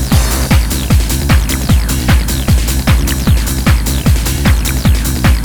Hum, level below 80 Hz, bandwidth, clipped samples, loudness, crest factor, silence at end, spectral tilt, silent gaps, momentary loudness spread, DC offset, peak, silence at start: none; -14 dBFS; over 20 kHz; under 0.1%; -12 LUFS; 10 dB; 0 s; -4.5 dB/octave; none; 1 LU; under 0.1%; 0 dBFS; 0 s